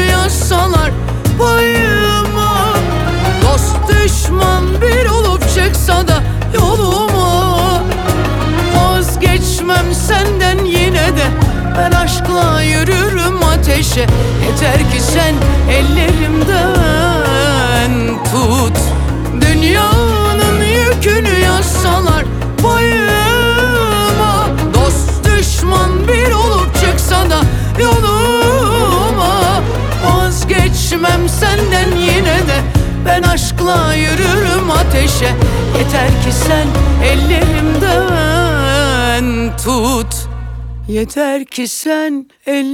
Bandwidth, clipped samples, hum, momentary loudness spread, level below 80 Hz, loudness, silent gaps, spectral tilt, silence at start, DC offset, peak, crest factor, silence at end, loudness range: 18 kHz; under 0.1%; none; 4 LU; -16 dBFS; -12 LUFS; none; -5 dB/octave; 0 s; under 0.1%; 0 dBFS; 10 dB; 0 s; 1 LU